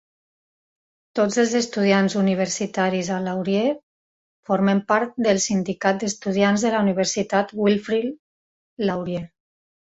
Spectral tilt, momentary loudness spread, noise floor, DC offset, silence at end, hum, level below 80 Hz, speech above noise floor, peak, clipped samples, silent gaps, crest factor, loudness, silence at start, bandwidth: -5 dB/octave; 7 LU; under -90 dBFS; under 0.1%; 0.65 s; none; -62 dBFS; over 69 dB; -4 dBFS; under 0.1%; 3.83-4.43 s, 8.19-8.77 s; 18 dB; -22 LUFS; 1.15 s; 8 kHz